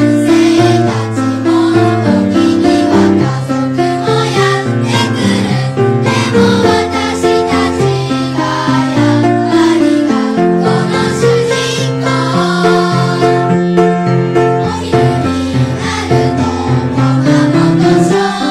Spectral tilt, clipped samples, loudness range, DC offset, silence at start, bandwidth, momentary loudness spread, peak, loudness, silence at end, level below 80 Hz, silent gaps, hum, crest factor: -6 dB/octave; under 0.1%; 1 LU; under 0.1%; 0 s; 13 kHz; 5 LU; 0 dBFS; -11 LUFS; 0 s; -40 dBFS; none; none; 10 dB